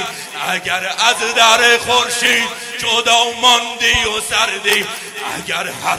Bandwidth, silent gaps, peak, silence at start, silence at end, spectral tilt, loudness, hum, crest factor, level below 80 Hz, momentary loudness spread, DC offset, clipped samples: over 20 kHz; none; 0 dBFS; 0 s; 0 s; -0.5 dB/octave; -13 LUFS; none; 16 dB; -44 dBFS; 11 LU; under 0.1%; under 0.1%